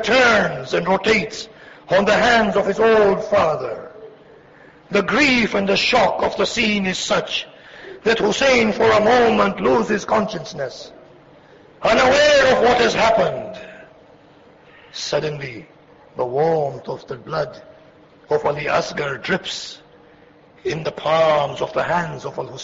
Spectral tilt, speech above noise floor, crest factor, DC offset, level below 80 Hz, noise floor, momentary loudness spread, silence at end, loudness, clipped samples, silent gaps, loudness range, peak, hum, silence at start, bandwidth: -4 dB/octave; 31 dB; 14 dB; under 0.1%; -48 dBFS; -49 dBFS; 16 LU; 0 s; -18 LUFS; under 0.1%; none; 8 LU; -6 dBFS; none; 0 s; 8 kHz